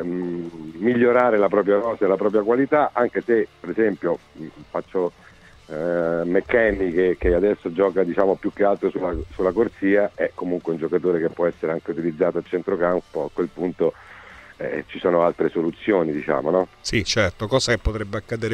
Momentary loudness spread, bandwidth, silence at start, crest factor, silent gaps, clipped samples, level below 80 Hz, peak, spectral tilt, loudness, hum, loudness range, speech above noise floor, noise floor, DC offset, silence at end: 10 LU; 10 kHz; 0 s; 18 dB; none; under 0.1%; -42 dBFS; -4 dBFS; -5.5 dB/octave; -22 LUFS; none; 5 LU; 22 dB; -44 dBFS; under 0.1%; 0 s